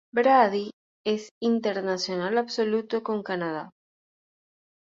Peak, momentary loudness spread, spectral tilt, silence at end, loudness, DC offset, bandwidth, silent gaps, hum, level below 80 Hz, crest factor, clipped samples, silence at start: -6 dBFS; 13 LU; -5 dB/octave; 1.2 s; -26 LUFS; under 0.1%; 7.6 kHz; 0.73-1.04 s, 1.31-1.41 s; none; -74 dBFS; 20 dB; under 0.1%; 0.15 s